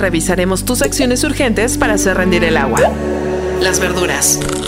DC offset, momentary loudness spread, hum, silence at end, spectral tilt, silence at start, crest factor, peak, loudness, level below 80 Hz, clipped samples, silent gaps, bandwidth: under 0.1%; 3 LU; none; 0 s; -3.5 dB/octave; 0 s; 14 dB; 0 dBFS; -14 LUFS; -28 dBFS; under 0.1%; none; 16.5 kHz